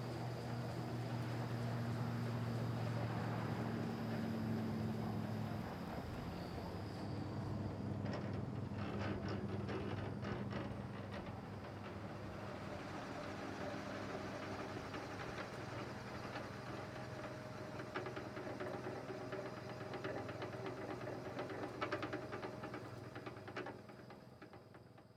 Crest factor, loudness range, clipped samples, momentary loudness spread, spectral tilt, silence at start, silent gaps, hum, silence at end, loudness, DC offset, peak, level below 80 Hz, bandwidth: 20 dB; 5 LU; under 0.1%; 7 LU; -7 dB/octave; 0 s; none; none; 0 s; -45 LUFS; under 0.1%; -26 dBFS; -66 dBFS; 15 kHz